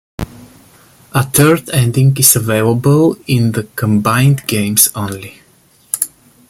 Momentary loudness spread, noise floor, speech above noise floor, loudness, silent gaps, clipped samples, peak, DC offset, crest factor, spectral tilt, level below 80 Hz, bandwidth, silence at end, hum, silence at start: 14 LU; -50 dBFS; 38 dB; -12 LUFS; none; 0.1%; 0 dBFS; under 0.1%; 14 dB; -4.5 dB/octave; -42 dBFS; over 20 kHz; 0.4 s; none; 0.2 s